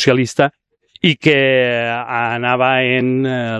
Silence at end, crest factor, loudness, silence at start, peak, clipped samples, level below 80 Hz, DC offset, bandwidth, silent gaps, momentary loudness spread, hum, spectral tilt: 0 s; 16 dB; -15 LUFS; 0 s; 0 dBFS; under 0.1%; -56 dBFS; under 0.1%; 12 kHz; none; 6 LU; none; -5.5 dB/octave